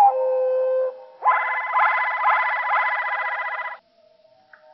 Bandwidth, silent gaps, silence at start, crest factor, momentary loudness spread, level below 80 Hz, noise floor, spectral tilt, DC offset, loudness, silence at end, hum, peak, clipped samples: 5.8 kHz; none; 0 s; 14 dB; 9 LU; under -90 dBFS; -57 dBFS; 5 dB/octave; under 0.1%; -21 LUFS; 0.95 s; none; -8 dBFS; under 0.1%